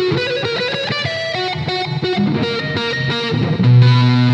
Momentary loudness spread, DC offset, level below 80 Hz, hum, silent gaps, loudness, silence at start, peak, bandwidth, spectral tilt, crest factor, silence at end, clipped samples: 9 LU; under 0.1%; -50 dBFS; none; none; -16 LUFS; 0 s; 0 dBFS; 7.6 kHz; -7 dB/octave; 16 dB; 0 s; under 0.1%